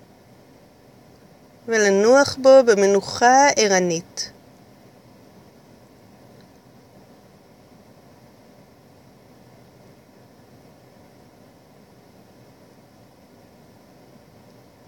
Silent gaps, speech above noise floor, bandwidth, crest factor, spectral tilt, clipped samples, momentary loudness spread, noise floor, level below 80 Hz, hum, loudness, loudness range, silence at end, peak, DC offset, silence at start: none; 35 dB; 16 kHz; 22 dB; -3 dB/octave; under 0.1%; 17 LU; -50 dBFS; -66 dBFS; none; -16 LUFS; 15 LU; 10.6 s; -2 dBFS; under 0.1%; 1.65 s